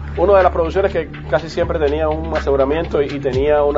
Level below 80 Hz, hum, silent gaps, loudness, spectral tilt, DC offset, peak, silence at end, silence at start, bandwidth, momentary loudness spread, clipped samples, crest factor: -28 dBFS; none; none; -17 LUFS; -7.5 dB/octave; under 0.1%; 0 dBFS; 0 s; 0 s; 7.8 kHz; 7 LU; under 0.1%; 16 dB